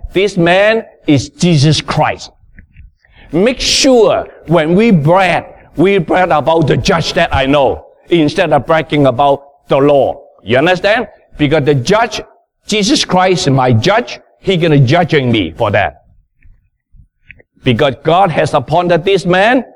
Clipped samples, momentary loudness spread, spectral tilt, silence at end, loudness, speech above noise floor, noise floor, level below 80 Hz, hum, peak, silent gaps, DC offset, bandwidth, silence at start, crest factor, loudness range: under 0.1%; 8 LU; -5.5 dB/octave; 0.1 s; -11 LUFS; 35 dB; -45 dBFS; -36 dBFS; none; 0 dBFS; none; under 0.1%; 13 kHz; 0.05 s; 12 dB; 3 LU